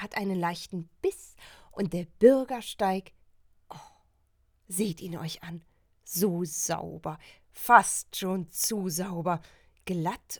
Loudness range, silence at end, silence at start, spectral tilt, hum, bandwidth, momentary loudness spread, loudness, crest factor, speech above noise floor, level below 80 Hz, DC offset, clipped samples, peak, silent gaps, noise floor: 8 LU; 0 s; 0 s; -4 dB/octave; none; over 20 kHz; 23 LU; -28 LUFS; 26 dB; 40 dB; -62 dBFS; under 0.1%; under 0.1%; -4 dBFS; none; -68 dBFS